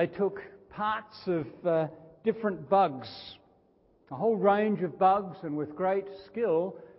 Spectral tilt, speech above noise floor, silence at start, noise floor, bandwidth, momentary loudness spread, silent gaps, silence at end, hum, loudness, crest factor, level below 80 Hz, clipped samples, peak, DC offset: -10.5 dB/octave; 36 dB; 0 s; -65 dBFS; 5.8 kHz; 16 LU; none; 0.1 s; none; -29 LUFS; 20 dB; -68 dBFS; under 0.1%; -10 dBFS; under 0.1%